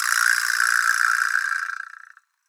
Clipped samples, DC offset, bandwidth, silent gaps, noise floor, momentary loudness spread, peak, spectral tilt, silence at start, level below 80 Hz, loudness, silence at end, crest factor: under 0.1%; under 0.1%; over 20 kHz; none; -50 dBFS; 13 LU; -2 dBFS; 13.5 dB/octave; 0 s; under -90 dBFS; -20 LUFS; 0.65 s; 20 dB